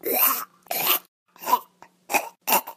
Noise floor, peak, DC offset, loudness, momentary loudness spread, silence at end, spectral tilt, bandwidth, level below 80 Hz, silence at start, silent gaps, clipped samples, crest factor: -51 dBFS; -4 dBFS; under 0.1%; -23 LUFS; 9 LU; 0.05 s; -0.5 dB/octave; 16 kHz; -80 dBFS; 0.05 s; 1.08-1.26 s; under 0.1%; 22 dB